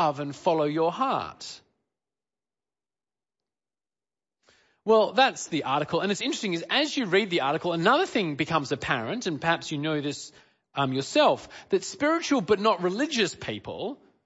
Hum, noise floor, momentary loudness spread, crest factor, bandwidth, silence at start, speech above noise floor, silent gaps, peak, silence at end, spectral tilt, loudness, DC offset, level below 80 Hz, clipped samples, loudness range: none; under -90 dBFS; 12 LU; 20 dB; 8 kHz; 0 s; over 64 dB; none; -8 dBFS; 0.3 s; -4.5 dB/octave; -26 LUFS; under 0.1%; -66 dBFS; under 0.1%; 6 LU